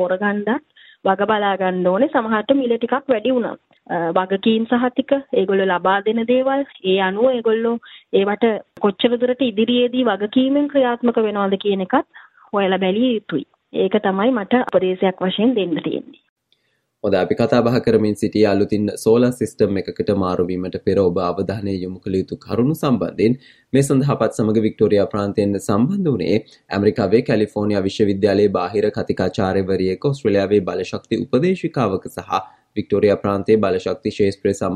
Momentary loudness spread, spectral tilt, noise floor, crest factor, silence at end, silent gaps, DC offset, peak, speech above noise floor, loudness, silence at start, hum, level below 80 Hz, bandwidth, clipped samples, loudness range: 7 LU; -6.5 dB/octave; -65 dBFS; 16 dB; 0 s; 16.29-16.36 s; under 0.1%; -2 dBFS; 47 dB; -19 LUFS; 0 s; none; -56 dBFS; 13.5 kHz; under 0.1%; 2 LU